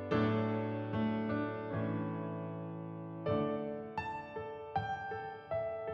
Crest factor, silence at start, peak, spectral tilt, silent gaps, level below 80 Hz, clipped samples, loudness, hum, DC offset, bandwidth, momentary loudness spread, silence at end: 16 dB; 0 s; -20 dBFS; -9 dB/octave; none; -66 dBFS; under 0.1%; -38 LUFS; none; under 0.1%; 6.6 kHz; 9 LU; 0 s